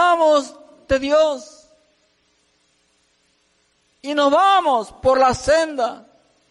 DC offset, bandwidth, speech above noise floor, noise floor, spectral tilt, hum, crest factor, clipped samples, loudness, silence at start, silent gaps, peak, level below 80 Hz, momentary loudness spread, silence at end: under 0.1%; 11.5 kHz; 46 dB; -63 dBFS; -3.5 dB/octave; none; 14 dB; under 0.1%; -17 LUFS; 0 s; none; -6 dBFS; -46 dBFS; 11 LU; 0.55 s